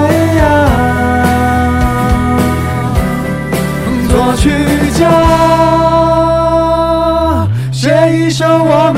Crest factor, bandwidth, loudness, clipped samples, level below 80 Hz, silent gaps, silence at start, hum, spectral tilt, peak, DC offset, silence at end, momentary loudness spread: 10 dB; 16.5 kHz; -10 LUFS; under 0.1%; -22 dBFS; none; 0 s; none; -6.5 dB/octave; 0 dBFS; 1%; 0 s; 6 LU